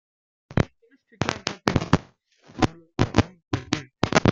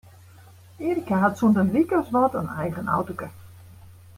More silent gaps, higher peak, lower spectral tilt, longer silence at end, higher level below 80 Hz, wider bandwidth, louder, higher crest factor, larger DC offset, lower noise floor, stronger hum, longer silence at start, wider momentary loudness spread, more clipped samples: neither; first, 0 dBFS vs -8 dBFS; second, -5.5 dB/octave vs -8 dB/octave; second, 0 s vs 0.25 s; first, -42 dBFS vs -58 dBFS; second, 9.2 kHz vs 16 kHz; second, -26 LUFS vs -23 LUFS; first, 26 dB vs 18 dB; neither; first, -55 dBFS vs -49 dBFS; neither; second, 0.5 s vs 0.8 s; second, 8 LU vs 12 LU; neither